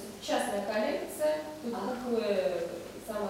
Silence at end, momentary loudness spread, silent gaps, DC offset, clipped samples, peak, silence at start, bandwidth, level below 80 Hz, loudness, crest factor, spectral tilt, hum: 0 s; 8 LU; none; under 0.1%; under 0.1%; -16 dBFS; 0 s; 16 kHz; -64 dBFS; -33 LUFS; 16 dB; -4 dB/octave; none